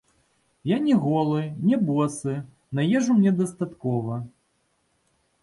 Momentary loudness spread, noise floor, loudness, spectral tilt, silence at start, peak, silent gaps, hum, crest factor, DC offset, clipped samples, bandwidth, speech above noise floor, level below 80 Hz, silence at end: 12 LU; -70 dBFS; -24 LUFS; -7 dB/octave; 0.65 s; -10 dBFS; none; none; 14 dB; under 0.1%; under 0.1%; 11.5 kHz; 47 dB; -64 dBFS; 1.15 s